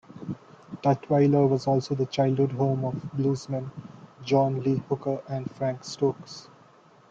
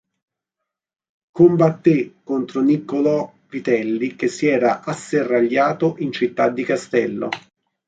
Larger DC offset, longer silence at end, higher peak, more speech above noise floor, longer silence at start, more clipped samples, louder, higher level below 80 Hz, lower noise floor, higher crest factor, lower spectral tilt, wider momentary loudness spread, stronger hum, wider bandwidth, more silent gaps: neither; first, 0.65 s vs 0.5 s; second, -10 dBFS vs -2 dBFS; second, 30 dB vs 64 dB; second, 0.1 s vs 1.35 s; neither; second, -26 LUFS vs -19 LUFS; about the same, -64 dBFS vs -64 dBFS; second, -55 dBFS vs -83 dBFS; about the same, 18 dB vs 18 dB; about the same, -7.5 dB/octave vs -7 dB/octave; first, 18 LU vs 10 LU; neither; second, 7.6 kHz vs 9.2 kHz; neither